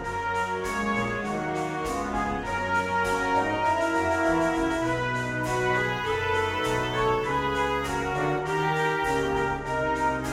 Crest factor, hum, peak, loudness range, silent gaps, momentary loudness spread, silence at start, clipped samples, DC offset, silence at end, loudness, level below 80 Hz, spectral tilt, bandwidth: 14 dB; none; -12 dBFS; 1 LU; none; 4 LU; 0 s; under 0.1%; under 0.1%; 0 s; -26 LUFS; -44 dBFS; -5 dB/octave; 16 kHz